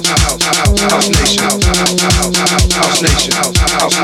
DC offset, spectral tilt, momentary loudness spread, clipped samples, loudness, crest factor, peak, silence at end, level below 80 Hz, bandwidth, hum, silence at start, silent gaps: under 0.1%; -3 dB/octave; 1 LU; under 0.1%; -10 LUFS; 12 dB; 0 dBFS; 0 s; -20 dBFS; 17.5 kHz; none; 0 s; none